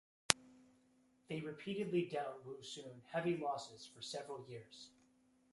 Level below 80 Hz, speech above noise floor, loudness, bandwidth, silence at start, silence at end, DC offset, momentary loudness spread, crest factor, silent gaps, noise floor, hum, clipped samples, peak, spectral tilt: -80 dBFS; 30 dB; -42 LUFS; 11.5 kHz; 0.3 s; 0.65 s; under 0.1%; 18 LU; 44 dB; none; -73 dBFS; none; under 0.1%; 0 dBFS; -3.5 dB/octave